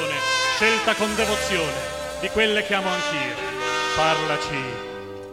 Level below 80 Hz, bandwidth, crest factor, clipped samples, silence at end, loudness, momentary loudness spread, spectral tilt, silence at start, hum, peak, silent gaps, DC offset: -48 dBFS; 16 kHz; 18 dB; under 0.1%; 0 s; -22 LUFS; 10 LU; -2.5 dB/octave; 0 s; none; -6 dBFS; none; 0.1%